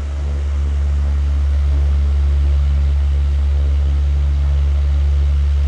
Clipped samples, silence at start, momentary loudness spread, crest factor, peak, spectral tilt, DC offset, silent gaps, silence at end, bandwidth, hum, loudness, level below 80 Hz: under 0.1%; 0 s; 3 LU; 6 dB; -8 dBFS; -7.5 dB/octave; under 0.1%; none; 0 s; 4.9 kHz; none; -17 LUFS; -16 dBFS